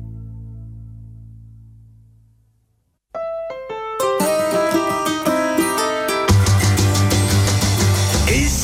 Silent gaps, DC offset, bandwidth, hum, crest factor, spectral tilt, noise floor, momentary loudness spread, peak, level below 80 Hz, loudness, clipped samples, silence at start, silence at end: none; under 0.1%; 16.5 kHz; none; 14 dB; -4.5 dB/octave; -65 dBFS; 20 LU; -4 dBFS; -32 dBFS; -17 LUFS; under 0.1%; 0 s; 0 s